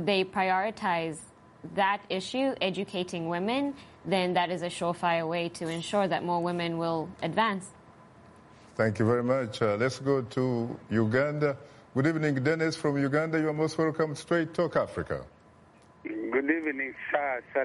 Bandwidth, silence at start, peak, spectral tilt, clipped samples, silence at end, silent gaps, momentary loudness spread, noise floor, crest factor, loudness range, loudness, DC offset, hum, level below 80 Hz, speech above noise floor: 11.5 kHz; 0 s; -14 dBFS; -6 dB/octave; under 0.1%; 0 s; none; 8 LU; -57 dBFS; 16 dB; 3 LU; -29 LUFS; under 0.1%; none; -64 dBFS; 28 dB